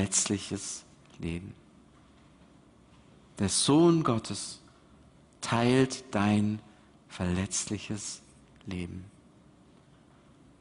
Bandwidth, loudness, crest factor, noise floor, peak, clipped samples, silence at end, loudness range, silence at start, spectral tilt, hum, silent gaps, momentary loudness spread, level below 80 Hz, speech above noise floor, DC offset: 11 kHz; -29 LUFS; 20 dB; -59 dBFS; -12 dBFS; under 0.1%; 1.5 s; 9 LU; 0 s; -4.5 dB/octave; none; none; 18 LU; -58 dBFS; 30 dB; under 0.1%